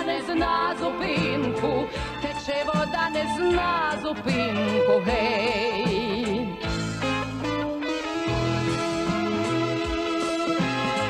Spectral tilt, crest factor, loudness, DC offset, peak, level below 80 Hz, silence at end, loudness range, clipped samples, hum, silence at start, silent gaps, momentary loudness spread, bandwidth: -5.5 dB/octave; 14 dB; -25 LUFS; under 0.1%; -10 dBFS; -44 dBFS; 0 s; 3 LU; under 0.1%; none; 0 s; none; 5 LU; 14.5 kHz